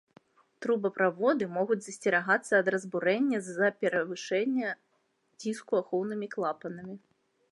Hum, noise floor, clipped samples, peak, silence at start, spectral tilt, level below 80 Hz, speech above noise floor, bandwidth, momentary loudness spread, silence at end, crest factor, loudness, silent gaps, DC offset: none; -73 dBFS; under 0.1%; -12 dBFS; 0.6 s; -5 dB/octave; -82 dBFS; 44 dB; 11.5 kHz; 12 LU; 0.55 s; 20 dB; -30 LUFS; none; under 0.1%